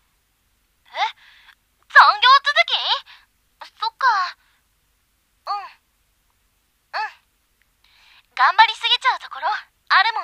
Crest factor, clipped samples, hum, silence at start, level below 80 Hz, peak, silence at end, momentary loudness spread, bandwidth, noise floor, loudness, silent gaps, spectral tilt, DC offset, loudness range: 22 dB; under 0.1%; none; 0.95 s; -70 dBFS; 0 dBFS; 0 s; 18 LU; 14.5 kHz; -65 dBFS; -17 LUFS; none; 2.5 dB/octave; under 0.1%; 17 LU